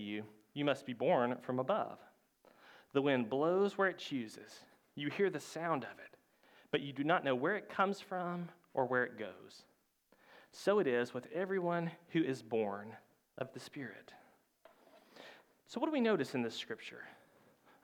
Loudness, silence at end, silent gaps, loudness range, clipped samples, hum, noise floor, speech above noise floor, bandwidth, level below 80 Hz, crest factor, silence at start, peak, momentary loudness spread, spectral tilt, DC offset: -37 LUFS; 0.7 s; none; 5 LU; under 0.1%; none; -73 dBFS; 36 dB; 17.5 kHz; -88 dBFS; 20 dB; 0 s; -18 dBFS; 21 LU; -6 dB/octave; under 0.1%